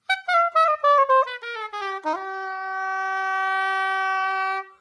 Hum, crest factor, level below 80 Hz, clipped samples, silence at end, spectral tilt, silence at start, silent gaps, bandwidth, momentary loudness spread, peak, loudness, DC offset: none; 16 dB; -80 dBFS; under 0.1%; 0.1 s; 0 dB/octave; 0.1 s; none; 11 kHz; 12 LU; -8 dBFS; -22 LUFS; under 0.1%